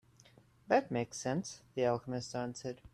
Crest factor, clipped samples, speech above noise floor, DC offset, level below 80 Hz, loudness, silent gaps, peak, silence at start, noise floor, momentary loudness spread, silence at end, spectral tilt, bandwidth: 20 dB; under 0.1%; 28 dB; under 0.1%; -68 dBFS; -36 LUFS; none; -16 dBFS; 0.7 s; -64 dBFS; 9 LU; 0.05 s; -5 dB/octave; 13 kHz